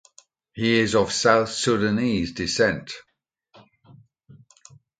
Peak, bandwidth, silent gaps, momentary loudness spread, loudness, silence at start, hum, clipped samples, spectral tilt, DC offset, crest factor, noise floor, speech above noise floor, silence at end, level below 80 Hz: -2 dBFS; 9.4 kHz; none; 15 LU; -22 LUFS; 0.55 s; none; under 0.1%; -4 dB/octave; under 0.1%; 24 dB; -58 dBFS; 37 dB; 2 s; -52 dBFS